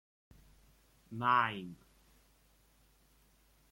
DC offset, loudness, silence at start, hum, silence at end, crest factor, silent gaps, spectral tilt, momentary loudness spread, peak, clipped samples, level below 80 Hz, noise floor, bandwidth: under 0.1%; -33 LUFS; 1.1 s; none; 1.95 s; 24 dB; none; -5.5 dB/octave; 22 LU; -16 dBFS; under 0.1%; -70 dBFS; -69 dBFS; 16.5 kHz